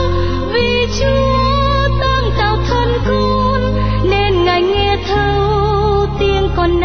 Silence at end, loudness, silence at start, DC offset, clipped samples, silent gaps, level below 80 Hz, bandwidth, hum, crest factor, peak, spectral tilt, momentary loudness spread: 0 s; -14 LUFS; 0 s; under 0.1%; under 0.1%; none; -20 dBFS; 6.6 kHz; none; 10 dB; -2 dBFS; -6.5 dB/octave; 2 LU